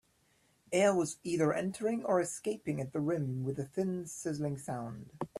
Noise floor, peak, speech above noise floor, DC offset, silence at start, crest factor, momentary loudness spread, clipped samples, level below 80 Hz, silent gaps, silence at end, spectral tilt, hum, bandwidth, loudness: -71 dBFS; -16 dBFS; 38 dB; under 0.1%; 0.7 s; 18 dB; 10 LU; under 0.1%; -70 dBFS; none; 0 s; -6 dB/octave; none; 14 kHz; -34 LUFS